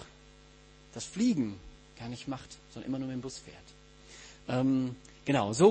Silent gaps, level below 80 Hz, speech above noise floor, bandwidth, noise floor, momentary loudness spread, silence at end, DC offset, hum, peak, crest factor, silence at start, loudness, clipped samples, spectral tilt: none; -60 dBFS; 26 dB; 8.8 kHz; -56 dBFS; 22 LU; 0 s; under 0.1%; none; -10 dBFS; 22 dB; 0 s; -33 LUFS; under 0.1%; -6 dB/octave